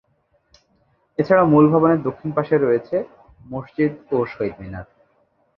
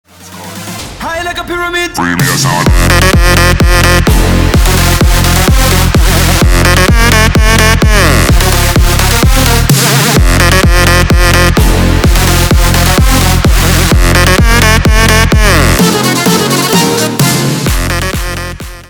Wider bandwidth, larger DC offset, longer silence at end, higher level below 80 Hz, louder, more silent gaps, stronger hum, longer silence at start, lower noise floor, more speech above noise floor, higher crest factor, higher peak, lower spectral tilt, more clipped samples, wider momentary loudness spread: second, 5.8 kHz vs over 20 kHz; neither; first, 0.75 s vs 0.05 s; second, -52 dBFS vs -12 dBFS; second, -19 LUFS vs -7 LUFS; neither; neither; first, 1.2 s vs 0.2 s; first, -64 dBFS vs -27 dBFS; first, 46 dB vs 18 dB; first, 18 dB vs 6 dB; about the same, -2 dBFS vs 0 dBFS; first, -10.5 dB/octave vs -4 dB/octave; neither; first, 20 LU vs 7 LU